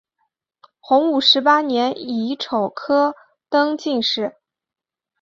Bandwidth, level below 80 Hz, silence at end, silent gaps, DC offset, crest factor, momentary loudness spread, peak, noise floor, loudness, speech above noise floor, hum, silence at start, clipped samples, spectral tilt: 7.6 kHz; -68 dBFS; 0.9 s; none; under 0.1%; 18 dB; 10 LU; -2 dBFS; -88 dBFS; -18 LUFS; 70 dB; none; 0.9 s; under 0.1%; -4 dB/octave